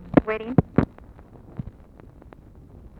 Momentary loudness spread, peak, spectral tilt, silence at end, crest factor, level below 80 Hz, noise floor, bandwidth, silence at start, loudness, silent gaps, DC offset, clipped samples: 18 LU; 0 dBFS; -10.5 dB/octave; 1.3 s; 26 dB; -42 dBFS; -47 dBFS; 5.2 kHz; 0.05 s; -23 LUFS; none; under 0.1%; under 0.1%